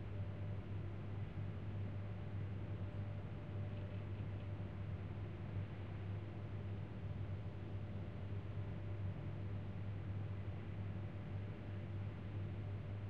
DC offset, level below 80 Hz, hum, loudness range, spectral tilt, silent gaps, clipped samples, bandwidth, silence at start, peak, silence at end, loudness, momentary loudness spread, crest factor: 0.2%; -58 dBFS; none; 1 LU; -9.5 dB/octave; none; under 0.1%; 4.8 kHz; 0 s; -34 dBFS; 0 s; -47 LUFS; 2 LU; 12 dB